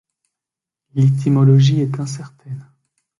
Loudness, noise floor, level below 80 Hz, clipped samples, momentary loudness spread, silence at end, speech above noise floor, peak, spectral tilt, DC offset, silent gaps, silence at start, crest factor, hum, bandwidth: -15 LUFS; -87 dBFS; -56 dBFS; under 0.1%; 21 LU; 0.6 s; 72 dB; -2 dBFS; -8 dB/octave; under 0.1%; none; 0.95 s; 16 dB; none; 11 kHz